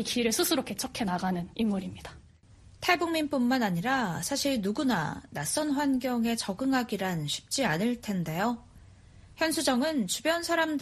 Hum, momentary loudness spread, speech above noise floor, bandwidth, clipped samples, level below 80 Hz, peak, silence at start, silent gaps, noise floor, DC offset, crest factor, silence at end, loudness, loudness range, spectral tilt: none; 6 LU; 26 dB; 13.5 kHz; under 0.1%; -58 dBFS; -8 dBFS; 0 s; none; -55 dBFS; under 0.1%; 20 dB; 0 s; -29 LUFS; 2 LU; -4 dB/octave